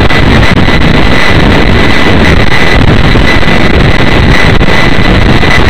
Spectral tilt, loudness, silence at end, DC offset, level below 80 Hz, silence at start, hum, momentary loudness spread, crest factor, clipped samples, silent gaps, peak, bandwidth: -6 dB/octave; -5 LUFS; 0 s; 40%; -10 dBFS; 0 s; none; 1 LU; 6 dB; 10%; none; 0 dBFS; 16 kHz